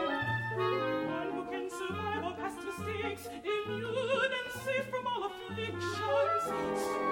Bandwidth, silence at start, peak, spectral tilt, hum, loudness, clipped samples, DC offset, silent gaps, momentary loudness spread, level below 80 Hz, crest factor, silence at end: 17 kHz; 0 s; -18 dBFS; -5 dB/octave; none; -34 LUFS; under 0.1%; under 0.1%; none; 8 LU; -66 dBFS; 16 dB; 0 s